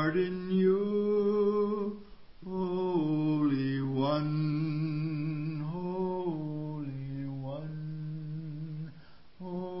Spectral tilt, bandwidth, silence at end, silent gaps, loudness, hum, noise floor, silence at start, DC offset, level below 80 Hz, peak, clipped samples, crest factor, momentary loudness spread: -11.5 dB/octave; 5.8 kHz; 0 s; none; -32 LUFS; none; -55 dBFS; 0 s; 0.3%; -62 dBFS; -16 dBFS; under 0.1%; 14 dB; 12 LU